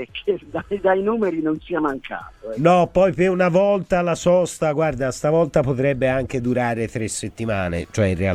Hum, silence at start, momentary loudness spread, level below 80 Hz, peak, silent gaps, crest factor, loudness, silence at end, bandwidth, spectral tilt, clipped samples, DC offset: none; 0 s; 9 LU; -44 dBFS; -4 dBFS; none; 16 dB; -20 LUFS; 0 s; 13.5 kHz; -6 dB/octave; under 0.1%; under 0.1%